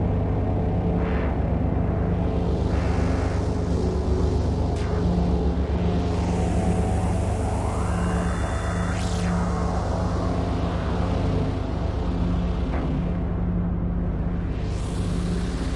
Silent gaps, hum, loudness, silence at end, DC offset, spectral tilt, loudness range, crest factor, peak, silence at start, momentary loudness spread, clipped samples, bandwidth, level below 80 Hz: none; none; -25 LUFS; 0 s; under 0.1%; -7.5 dB/octave; 2 LU; 12 dB; -12 dBFS; 0 s; 3 LU; under 0.1%; 11.5 kHz; -28 dBFS